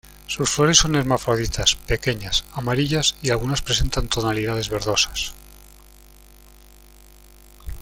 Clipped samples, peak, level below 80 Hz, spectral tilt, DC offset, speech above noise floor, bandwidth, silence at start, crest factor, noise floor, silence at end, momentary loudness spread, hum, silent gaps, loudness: under 0.1%; 0 dBFS; -34 dBFS; -3 dB/octave; under 0.1%; 26 dB; 17 kHz; 0.3 s; 22 dB; -47 dBFS; 0 s; 9 LU; 50 Hz at -45 dBFS; none; -21 LUFS